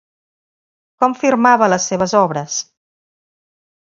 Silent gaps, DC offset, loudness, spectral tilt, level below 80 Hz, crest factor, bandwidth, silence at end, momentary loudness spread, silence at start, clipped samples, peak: none; under 0.1%; -15 LUFS; -4 dB/octave; -62 dBFS; 18 dB; 7.6 kHz; 1.2 s; 11 LU; 1 s; under 0.1%; 0 dBFS